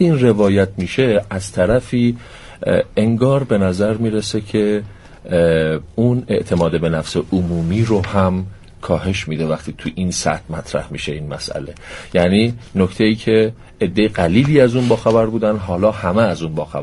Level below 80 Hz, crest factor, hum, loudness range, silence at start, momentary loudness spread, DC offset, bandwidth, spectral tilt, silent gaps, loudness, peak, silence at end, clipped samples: -40 dBFS; 16 dB; none; 5 LU; 0 s; 10 LU; under 0.1%; 11.5 kHz; -6.5 dB/octave; none; -17 LUFS; 0 dBFS; 0 s; under 0.1%